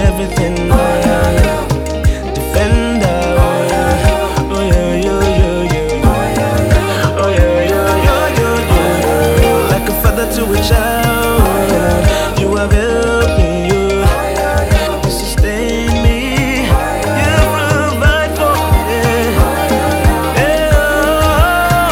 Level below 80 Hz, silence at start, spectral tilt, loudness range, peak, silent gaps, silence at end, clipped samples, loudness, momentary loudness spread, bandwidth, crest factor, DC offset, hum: -18 dBFS; 0 s; -5.5 dB/octave; 2 LU; 0 dBFS; none; 0 s; under 0.1%; -12 LUFS; 4 LU; 17 kHz; 12 dB; under 0.1%; none